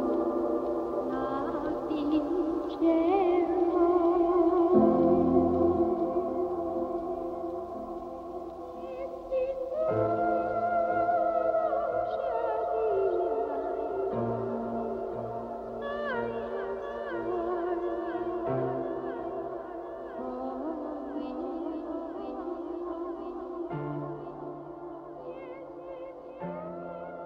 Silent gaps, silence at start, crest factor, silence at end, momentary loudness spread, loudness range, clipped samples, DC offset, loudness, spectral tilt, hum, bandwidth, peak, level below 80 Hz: none; 0 s; 20 dB; 0 s; 15 LU; 12 LU; under 0.1%; under 0.1%; -30 LUFS; -9 dB/octave; none; 5.2 kHz; -10 dBFS; -58 dBFS